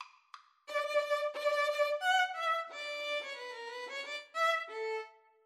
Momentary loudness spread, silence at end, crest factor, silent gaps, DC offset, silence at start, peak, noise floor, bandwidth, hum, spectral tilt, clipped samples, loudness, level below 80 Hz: 12 LU; 0.35 s; 16 dB; none; under 0.1%; 0 s; -20 dBFS; -58 dBFS; 14.5 kHz; none; 3 dB/octave; under 0.1%; -34 LUFS; under -90 dBFS